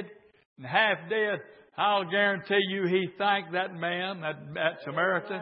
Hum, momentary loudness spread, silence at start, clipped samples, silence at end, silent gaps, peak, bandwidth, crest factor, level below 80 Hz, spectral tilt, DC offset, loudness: none; 10 LU; 0 s; under 0.1%; 0 s; 0.45-0.56 s; -10 dBFS; 5.8 kHz; 20 dB; -78 dBFS; -9 dB/octave; under 0.1%; -28 LUFS